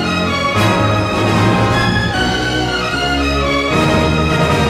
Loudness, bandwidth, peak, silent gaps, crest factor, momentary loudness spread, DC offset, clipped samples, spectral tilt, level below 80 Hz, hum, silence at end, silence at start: -14 LUFS; 15.5 kHz; -2 dBFS; none; 12 dB; 3 LU; under 0.1%; under 0.1%; -5.5 dB/octave; -28 dBFS; none; 0 s; 0 s